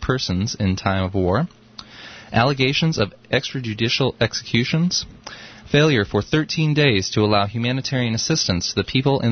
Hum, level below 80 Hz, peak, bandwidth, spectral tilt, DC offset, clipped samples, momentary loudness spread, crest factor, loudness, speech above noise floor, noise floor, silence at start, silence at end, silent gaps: none; -44 dBFS; -4 dBFS; 6.6 kHz; -5 dB/octave; under 0.1%; under 0.1%; 13 LU; 16 dB; -20 LUFS; 21 dB; -40 dBFS; 0 s; 0 s; none